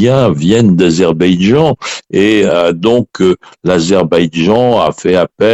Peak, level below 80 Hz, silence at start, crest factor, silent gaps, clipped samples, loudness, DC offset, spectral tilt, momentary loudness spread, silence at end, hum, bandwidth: 0 dBFS; -42 dBFS; 0 s; 10 dB; none; under 0.1%; -10 LUFS; under 0.1%; -6 dB/octave; 4 LU; 0 s; none; 9.8 kHz